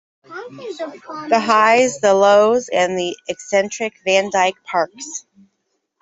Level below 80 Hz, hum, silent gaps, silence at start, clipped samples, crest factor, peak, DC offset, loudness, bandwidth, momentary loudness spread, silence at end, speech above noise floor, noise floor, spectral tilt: -66 dBFS; none; none; 0.3 s; under 0.1%; 16 dB; -2 dBFS; under 0.1%; -16 LUFS; 8 kHz; 19 LU; 0.8 s; 53 dB; -70 dBFS; -3 dB/octave